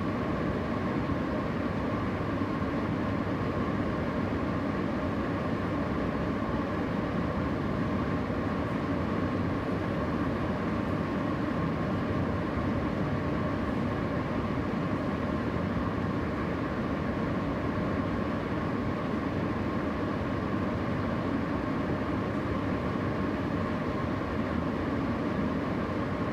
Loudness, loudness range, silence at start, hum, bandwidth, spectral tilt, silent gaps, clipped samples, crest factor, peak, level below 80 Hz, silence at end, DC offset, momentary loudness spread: -31 LUFS; 1 LU; 0 s; none; 16 kHz; -8 dB/octave; none; under 0.1%; 12 dB; -18 dBFS; -46 dBFS; 0 s; under 0.1%; 1 LU